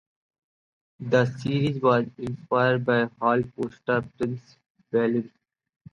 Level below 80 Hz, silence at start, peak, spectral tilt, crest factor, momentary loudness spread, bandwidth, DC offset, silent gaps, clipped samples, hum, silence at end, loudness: -62 dBFS; 1 s; -8 dBFS; -7.5 dB/octave; 18 dB; 10 LU; 9.2 kHz; under 0.1%; 4.70-4.75 s; under 0.1%; none; 0.65 s; -25 LUFS